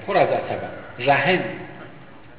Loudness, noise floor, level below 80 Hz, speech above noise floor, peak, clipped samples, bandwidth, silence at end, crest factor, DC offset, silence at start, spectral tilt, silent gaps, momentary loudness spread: -21 LUFS; -44 dBFS; -56 dBFS; 23 dB; -6 dBFS; under 0.1%; 4 kHz; 0.1 s; 18 dB; 0.6%; 0 s; -9 dB/octave; none; 21 LU